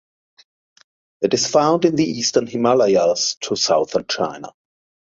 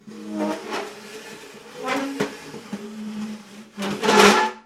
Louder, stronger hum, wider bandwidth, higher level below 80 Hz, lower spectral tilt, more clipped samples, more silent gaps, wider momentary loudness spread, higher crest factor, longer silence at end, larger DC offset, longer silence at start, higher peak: first, -18 LUFS vs -21 LUFS; neither; second, 7.8 kHz vs 16 kHz; about the same, -60 dBFS vs -62 dBFS; about the same, -3.5 dB/octave vs -3.5 dB/octave; neither; first, 3.37-3.41 s vs none; second, 8 LU vs 24 LU; second, 18 dB vs 24 dB; first, 0.55 s vs 0.05 s; neither; first, 1.2 s vs 0.05 s; about the same, -2 dBFS vs 0 dBFS